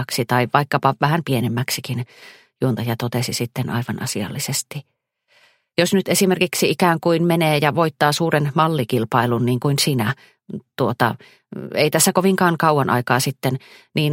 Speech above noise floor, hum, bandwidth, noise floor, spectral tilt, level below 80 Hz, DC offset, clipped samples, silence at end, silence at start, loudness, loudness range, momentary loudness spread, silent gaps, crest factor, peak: 41 dB; none; 16.5 kHz; -60 dBFS; -4.5 dB/octave; -60 dBFS; under 0.1%; under 0.1%; 0 s; 0 s; -19 LUFS; 6 LU; 10 LU; none; 20 dB; 0 dBFS